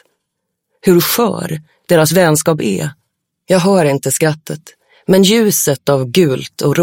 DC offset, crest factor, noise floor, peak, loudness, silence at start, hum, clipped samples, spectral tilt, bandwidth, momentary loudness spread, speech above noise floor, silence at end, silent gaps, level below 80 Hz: under 0.1%; 14 dB; -74 dBFS; 0 dBFS; -13 LUFS; 0.85 s; none; under 0.1%; -4.5 dB/octave; 17 kHz; 14 LU; 61 dB; 0 s; none; -52 dBFS